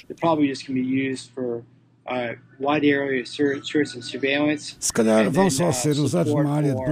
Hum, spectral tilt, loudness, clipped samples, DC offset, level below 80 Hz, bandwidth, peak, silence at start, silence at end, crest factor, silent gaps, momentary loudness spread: none; -5 dB/octave; -22 LUFS; under 0.1%; under 0.1%; -56 dBFS; 15.5 kHz; -6 dBFS; 0.1 s; 0 s; 18 dB; none; 11 LU